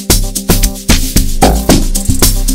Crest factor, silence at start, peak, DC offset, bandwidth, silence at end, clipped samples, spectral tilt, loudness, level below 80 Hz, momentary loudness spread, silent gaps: 10 dB; 0 s; 0 dBFS; under 0.1%; over 20 kHz; 0 s; 2%; -3.5 dB/octave; -11 LUFS; -12 dBFS; 3 LU; none